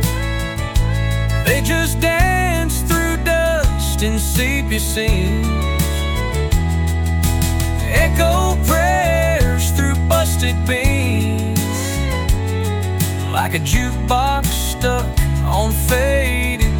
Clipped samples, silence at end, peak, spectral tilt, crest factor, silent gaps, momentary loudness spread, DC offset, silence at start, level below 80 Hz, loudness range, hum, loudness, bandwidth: under 0.1%; 0 s; -4 dBFS; -5 dB/octave; 12 dB; none; 4 LU; under 0.1%; 0 s; -20 dBFS; 3 LU; none; -17 LUFS; 17.5 kHz